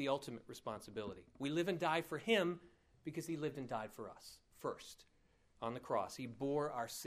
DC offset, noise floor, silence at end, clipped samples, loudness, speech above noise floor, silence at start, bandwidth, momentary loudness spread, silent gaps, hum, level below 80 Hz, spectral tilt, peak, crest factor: under 0.1%; -73 dBFS; 0 s; under 0.1%; -42 LUFS; 31 dB; 0 s; 15.5 kHz; 16 LU; none; none; -74 dBFS; -5 dB/octave; -22 dBFS; 22 dB